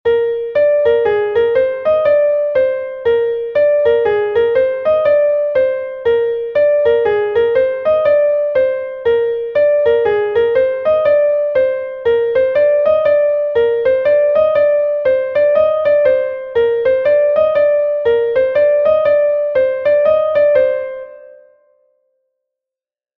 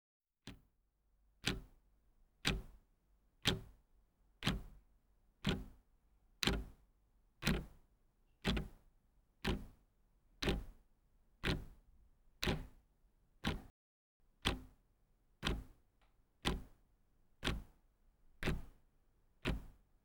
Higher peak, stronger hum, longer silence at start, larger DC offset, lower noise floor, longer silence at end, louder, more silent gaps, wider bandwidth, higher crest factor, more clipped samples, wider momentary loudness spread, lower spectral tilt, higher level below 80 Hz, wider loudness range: first, -2 dBFS vs -16 dBFS; neither; second, 0.05 s vs 0.45 s; neither; first, -89 dBFS vs -78 dBFS; first, 1.9 s vs 0.35 s; first, -14 LUFS vs -42 LUFS; second, none vs 13.70-14.20 s; second, 4.6 kHz vs over 20 kHz; second, 12 dB vs 30 dB; neither; second, 4 LU vs 20 LU; first, -6.5 dB/octave vs -4.5 dB/octave; about the same, -50 dBFS vs -52 dBFS; about the same, 1 LU vs 3 LU